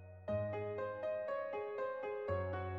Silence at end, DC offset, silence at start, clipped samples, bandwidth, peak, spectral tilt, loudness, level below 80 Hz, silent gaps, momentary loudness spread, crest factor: 0 s; under 0.1%; 0 s; under 0.1%; 5.8 kHz; -28 dBFS; -9 dB/octave; -41 LUFS; -70 dBFS; none; 2 LU; 14 dB